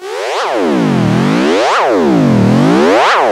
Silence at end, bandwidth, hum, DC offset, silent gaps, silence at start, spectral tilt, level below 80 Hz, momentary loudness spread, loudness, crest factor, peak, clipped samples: 0 s; 14.5 kHz; none; under 0.1%; none; 0 s; -6 dB/octave; -44 dBFS; 5 LU; -10 LUFS; 10 dB; 0 dBFS; under 0.1%